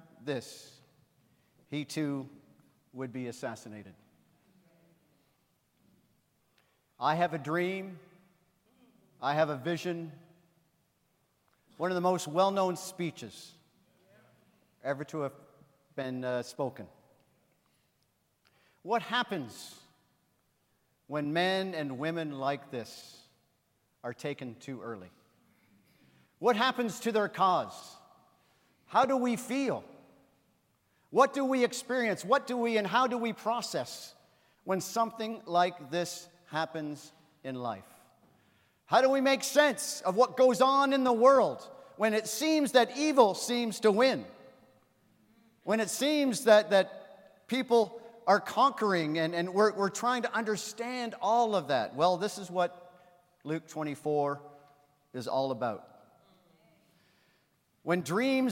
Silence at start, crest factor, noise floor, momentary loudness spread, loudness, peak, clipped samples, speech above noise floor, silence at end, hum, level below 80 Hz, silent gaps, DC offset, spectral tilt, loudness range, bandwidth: 0.2 s; 24 dB; -75 dBFS; 18 LU; -30 LUFS; -8 dBFS; under 0.1%; 45 dB; 0 s; none; -84 dBFS; none; under 0.1%; -4.5 dB/octave; 14 LU; 16.5 kHz